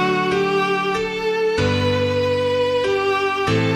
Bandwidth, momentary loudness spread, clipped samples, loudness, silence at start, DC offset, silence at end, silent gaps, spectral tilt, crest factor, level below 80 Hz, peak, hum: 15 kHz; 2 LU; under 0.1%; -19 LUFS; 0 s; under 0.1%; 0 s; none; -5.5 dB/octave; 14 dB; -46 dBFS; -6 dBFS; none